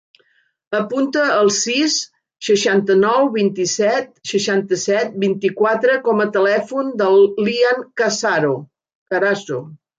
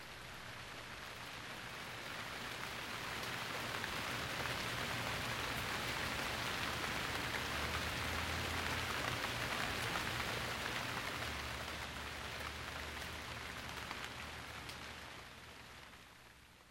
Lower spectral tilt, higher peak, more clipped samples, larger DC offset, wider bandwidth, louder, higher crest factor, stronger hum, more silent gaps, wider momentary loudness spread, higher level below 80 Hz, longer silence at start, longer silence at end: about the same, -3.5 dB/octave vs -3 dB/octave; first, -4 dBFS vs -24 dBFS; neither; neither; second, 9 kHz vs 18 kHz; first, -17 LUFS vs -41 LUFS; second, 14 dB vs 20 dB; neither; first, 8.95-9.06 s vs none; second, 8 LU vs 11 LU; second, -68 dBFS vs -58 dBFS; first, 0.7 s vs 0 s; first, 0.25 s vs 0 s